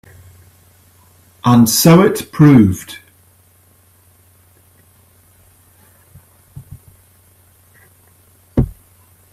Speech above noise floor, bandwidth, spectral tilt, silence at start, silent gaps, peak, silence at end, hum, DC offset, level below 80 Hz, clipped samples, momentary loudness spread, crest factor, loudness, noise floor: 41 dB; 16 kHz; -6 dB/octave; 1.45 s; none; 0 dBFS; 0.6 s; none; under 0.1%; -40 dBFS; under 0.1%; 17 LU; 18 dB; -12 LUFS; -51 dBFS